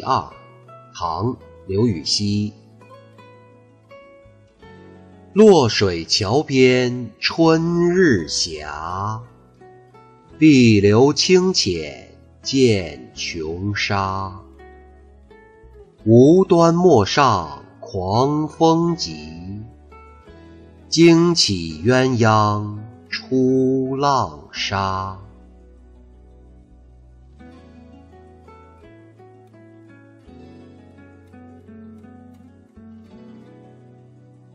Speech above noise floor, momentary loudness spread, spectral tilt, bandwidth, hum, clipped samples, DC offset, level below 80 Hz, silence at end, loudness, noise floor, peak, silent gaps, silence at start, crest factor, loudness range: 33 dB; 19 LU; -5.5 dB/octave; 9.6 kHz; none; under 0.1%; under 0.1%; -50 dBFS; 1.2 s; -17 LUFS; -49 dBFS; -2 dBFS; none; 0 s; 18 dB; 9 LU